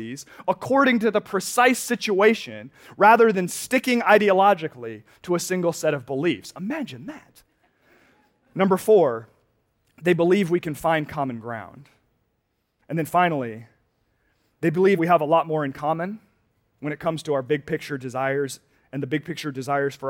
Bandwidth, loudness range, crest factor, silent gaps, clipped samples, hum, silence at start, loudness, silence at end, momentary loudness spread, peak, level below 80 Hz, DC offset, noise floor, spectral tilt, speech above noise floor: 17 kHz; 8 LU; 20 dB; none; under 0.1%; none; 0 s; -22 LUFS; 0 s; 17 LU; -4 dBFS; -66 dBFS; under 0.1%; -73 dBFS; -5 dB/octave; 51 dB